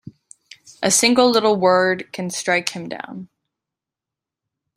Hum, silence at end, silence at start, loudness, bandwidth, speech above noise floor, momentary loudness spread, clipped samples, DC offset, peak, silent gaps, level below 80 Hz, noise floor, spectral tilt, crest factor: none; 1.5 s; 0.05 s; -17 LUFS; 16 kHz; 69 dB; 17 LU; under 0.1%; under 0.1%; -2 dBFS; none; -64 dBFS; -87 dBFS; -3 dB/octave; 20 dB